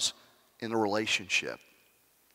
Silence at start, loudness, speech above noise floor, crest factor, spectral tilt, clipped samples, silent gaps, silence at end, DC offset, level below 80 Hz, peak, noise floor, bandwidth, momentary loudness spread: 0 s; -30 LUFS; 35 dB; 16 dB; -2 dB/octave; under 0.1%; none; 0.8 s; under 0.1%; -78 dBFS; -18 dBFS; -66 dBFS; 16 kHz; 14 LU